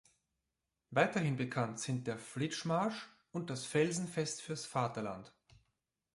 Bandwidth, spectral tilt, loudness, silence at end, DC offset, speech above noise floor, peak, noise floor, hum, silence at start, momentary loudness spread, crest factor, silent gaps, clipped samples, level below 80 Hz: 11.5 kHz; -5 dB/octave; -37 LUFS; 0.85 s; under 0.1%; 52 dB; -16 dBFS; -88 dBFS; none; 0.9 s; 10 LU; 22 dB; none; under 0.1%; -74 dBFS